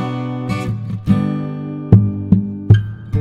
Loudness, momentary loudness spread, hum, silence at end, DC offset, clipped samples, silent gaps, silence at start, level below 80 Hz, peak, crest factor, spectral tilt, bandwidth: -17 LUFS; 10 LU; none; 0 s; under 0.1%; 0.3%; none; 0 s; -36 dBFS; 0 dBFS; 16 dB; -9.5 dB/octave; 7.2 kHz